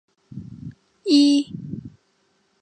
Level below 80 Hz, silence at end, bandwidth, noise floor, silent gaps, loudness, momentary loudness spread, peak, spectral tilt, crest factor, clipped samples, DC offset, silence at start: -58 dBFS; 0.75 s; 10.5 kHz; -66 dBFS; none; -19 LUFS; 25 LU; -6 dBFS; -5 dB/octave; 18 dB; under 0.1%; under 0.1%; 0.35 s